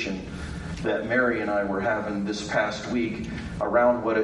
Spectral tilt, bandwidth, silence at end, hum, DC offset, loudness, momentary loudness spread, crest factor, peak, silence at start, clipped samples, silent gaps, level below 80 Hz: -5.5 dB/octave; 11.5 kHz; 0 s; none; under 0.1%; -26 LUFS; 12 LU; 16 dB; -10 dBFS; 0 s; under 0.1%; none; -46 dBFS